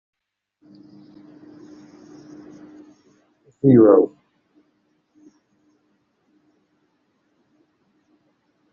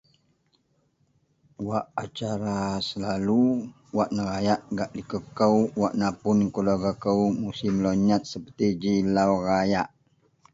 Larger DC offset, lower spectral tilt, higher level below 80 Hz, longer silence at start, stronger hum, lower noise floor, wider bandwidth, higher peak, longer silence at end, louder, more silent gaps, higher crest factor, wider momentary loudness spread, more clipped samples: neither; first, -11 dB/octave vs -6.5 dB/octave; second, -64 dBFS vs -54 dBFS; first, 3.65 s vs 1.6 s; neither; about the same, -68 dBFS vs -68 dBFS; second, 6.6 kHz vs 7.8 kHz; first, -2 dBFS vs -8 dBFS; first, 4.65 s vs 0.65 s; first, -15 LUFS vs -25 LUFS; neither; about the same, 22 dB vs 18 dB; first, 32 LU vs 9 LU; neither